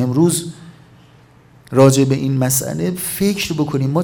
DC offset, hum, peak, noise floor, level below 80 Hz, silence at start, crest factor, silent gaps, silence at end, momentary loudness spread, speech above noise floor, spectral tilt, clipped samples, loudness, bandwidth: under 0.1%; none; 0 dBFS; -47 dBFS; -50 dBFS; 0 s; 16 dB; none; 0 s; 9 LU; 31 dB; -5.5 dB/octave; under 0.1%; -16 LUFS; 19 kHz